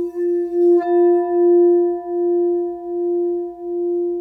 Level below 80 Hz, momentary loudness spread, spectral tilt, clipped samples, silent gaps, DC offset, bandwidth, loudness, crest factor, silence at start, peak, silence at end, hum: -62 dBFS; 10 LU; -8.5 dB/octave; under 0.1%; none; under 0.1%; 1.9 kHz; -18 LUFS; 10 dB; 0 s; -8 dBFS; 0 s; none